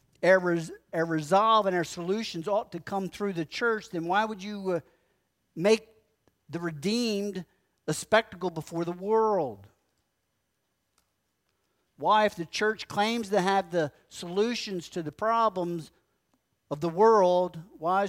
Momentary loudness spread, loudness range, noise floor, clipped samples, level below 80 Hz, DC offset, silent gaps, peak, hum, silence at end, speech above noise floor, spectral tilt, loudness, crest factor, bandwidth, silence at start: 12 LU; 4 LU; -78 dBFS; under 0.1%; -68 dBFS; under 0.1%; none; -8 dBFS; none; 0 s; 51 dB; -5 dB/octave; -28 LUFS; 20 dB; 16 kHz; 0.2 s